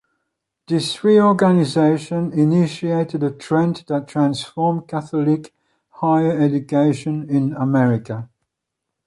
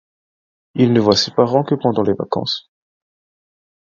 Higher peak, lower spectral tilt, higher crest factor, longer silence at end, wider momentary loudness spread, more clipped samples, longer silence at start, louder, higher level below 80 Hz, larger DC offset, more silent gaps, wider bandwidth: second, -4 dBFS vs 0 dBFS; first, -7.5 dB/octave vs -6 dB/octave; about the same, 16 dB vs 18 dB; second, 0.8 s vs 1.3 s; about the same, 9 LU vs 9 LU; neither; about the same, 0.7 s vs 0.75 s; about the same, -18 LUFS vs -17 LUFS; second, -60 dBFS vs -54 dBFS; neither; neither; first, 11.5 kHz vs 7.6 kHz